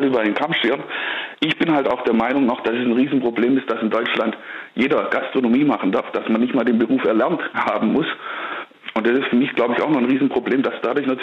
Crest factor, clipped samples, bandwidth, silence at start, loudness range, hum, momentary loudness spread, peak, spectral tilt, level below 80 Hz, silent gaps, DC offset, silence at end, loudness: 12 dB; under 0.1%; 6.4 kHz; 0 s; 1 LU; none; 6 LU; -6 dBFS; -7 dB/octave; -62 dBFS; none; under 0.1%; 0 s; -19 LUFS